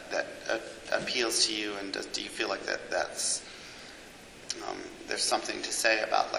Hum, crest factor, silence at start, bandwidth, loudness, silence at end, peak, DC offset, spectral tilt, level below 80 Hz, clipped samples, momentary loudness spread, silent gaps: none; 24 dB; 0 s; 16 kHz; -30 LUFS; 0 s; -8 dBFS; under 0.1%; -0.5 dB/octave; -64 dBFS; under 0.1%; 18 LU; none